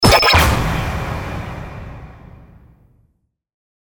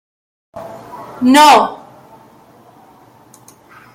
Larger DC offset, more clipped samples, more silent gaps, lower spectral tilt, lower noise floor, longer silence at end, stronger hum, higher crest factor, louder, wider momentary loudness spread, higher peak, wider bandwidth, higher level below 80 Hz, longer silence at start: neither; neither; neither; first, -4 dB/octave vs -2.5 dB/octave; first, -64 dBFS vs -45 dBFS; second, 1.45 s vs 2.2 s; neither; about the same, 18 dB vs 16 dB; second, -15 LUFS vs -9 LUFS; second, 24 LU vs 27 LU; about the same, 0 dBFS vs 0 dBFS; first, over 20 kHz vs 16.5 kHz; first, -28 dBFS vs -60 dBFS; second, 0 s vs 0.55 s